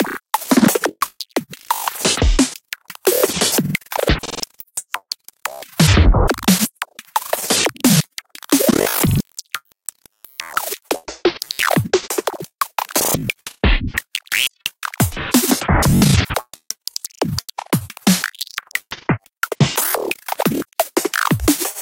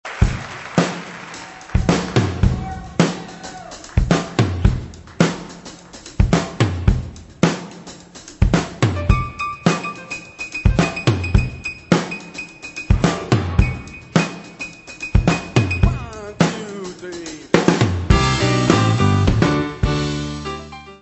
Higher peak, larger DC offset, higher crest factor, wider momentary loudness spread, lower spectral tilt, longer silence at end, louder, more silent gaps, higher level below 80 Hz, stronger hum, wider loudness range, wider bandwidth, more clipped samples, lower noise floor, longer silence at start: about the same, 0 dBFS vs 0 dBFS; neither; about the same, 18 dB vs 20 dB; second, 13 LU vs 16 LU; second, -4 dB/octave vs -6 dB/octave; about the same, 0 s vs 0.05 s; about the same, -18 LUFS vs -19 LUFS; first, 12.55-12.59 s vs none; about the same, -28 dBFS vs -26 dBFS; neither; about the same, 4 LU vs 4 LU; first, 17.5 kHz vs 8.4 kHz; neither; first, -47 dBFS vs -40 dBFS; about the same, 0 s vs 0.05 s